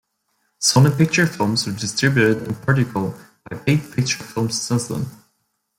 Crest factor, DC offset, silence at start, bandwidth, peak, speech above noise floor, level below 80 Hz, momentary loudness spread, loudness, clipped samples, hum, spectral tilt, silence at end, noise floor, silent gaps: 16 dB; under 0.1%; 0.6 s; 16.5 kHz; -4 dBFS; 51 dB; -54 dBFS; 12 LU; -19 LUFS; under 0.1%; none; -4.5 dB/octave; 0.65 s; -70 dBFS; none